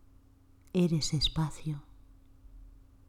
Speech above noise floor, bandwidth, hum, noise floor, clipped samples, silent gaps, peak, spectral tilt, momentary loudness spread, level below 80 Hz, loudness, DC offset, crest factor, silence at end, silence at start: 29 dB; 15 kHz; none; -60 dBFS; under 0.1%; none; -16 dBFS; -5.5 dB/octave; 11 LU; -48 dBFS; -31 LUFS; under 0.1%; 18 dB; 0.35 s; 0.75 s